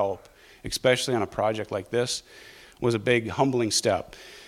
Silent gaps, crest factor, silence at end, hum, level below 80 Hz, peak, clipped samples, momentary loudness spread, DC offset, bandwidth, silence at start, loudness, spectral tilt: none; 20 dB; 0 s; none; -54 dBFS; -8 dBFS; under 0.1%; 12 LU; under 0.1%; 16 kHz; 0 s; -26 LUFS; -4 dB/octave